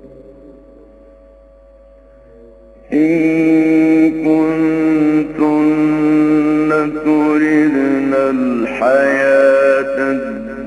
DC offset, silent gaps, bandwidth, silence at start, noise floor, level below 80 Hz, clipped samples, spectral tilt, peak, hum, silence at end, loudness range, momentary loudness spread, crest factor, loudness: under 0.1%; none; 9.8 kHz; 0.05 s; -43 dBFS; -48 dBFS; under 0.1%; -7.5 dB/octave; 0 dBFS; none; 0 s; 5 LU; 5 LU; 14 dB; -13 LUFS